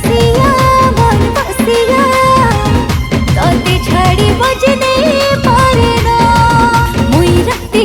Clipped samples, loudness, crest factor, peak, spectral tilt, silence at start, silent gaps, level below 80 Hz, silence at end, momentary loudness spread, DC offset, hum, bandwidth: under 0.1%; -9 LUFS; 8 dB; 0 dBFS; -5.5 dB/octave; 0 s; none; -20 dBFS; 0 s; 4 LU; under 0.1%; none; 19 kHz